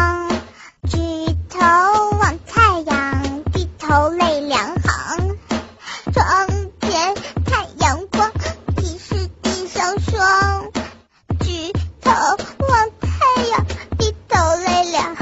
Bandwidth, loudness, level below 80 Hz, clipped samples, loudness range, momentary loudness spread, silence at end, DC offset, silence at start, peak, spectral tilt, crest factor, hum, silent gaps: 8 kHz; -18 LUFS; -34 dBFS; under 0.1%; 4 LU; 10 LU; 0 s; under 0.1%; 0 s; 0 dBFS; -4.5 dB/octave; 18 dB; none; none